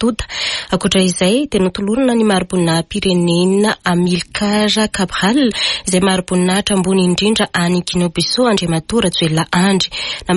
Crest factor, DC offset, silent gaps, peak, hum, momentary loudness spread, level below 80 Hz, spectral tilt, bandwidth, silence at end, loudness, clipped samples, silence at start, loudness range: 12 dB; under 0.1%; none; -2 dBFS; none; 4 LU; -40 dBFS; -4.5 dB/octave; 11.5 kHz; 0 s; -14 LUFS; under 0.1%; 0 s; 1 LU